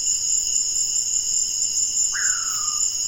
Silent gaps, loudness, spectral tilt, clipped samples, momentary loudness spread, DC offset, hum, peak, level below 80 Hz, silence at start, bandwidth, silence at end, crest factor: none; -19 LUFS; 3.5 dB/octave; under 0.1%; 1 LU; under 0.1%; none; -8 dBFS; -52 dBFS; 0 s; 16.5 kHz; 0 s; 14 dB